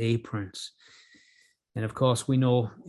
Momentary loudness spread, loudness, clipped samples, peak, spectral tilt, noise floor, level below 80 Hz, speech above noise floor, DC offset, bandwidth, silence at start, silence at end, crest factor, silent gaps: 16 LU; -27 LUFS; under 0.1%; -12 dBFS; -6.5 dB/octave; -64 dBFS; -60 dBFS; 37 dB; under 0.1%; 12 kHz; 0 s; 0 s; 18 dB; none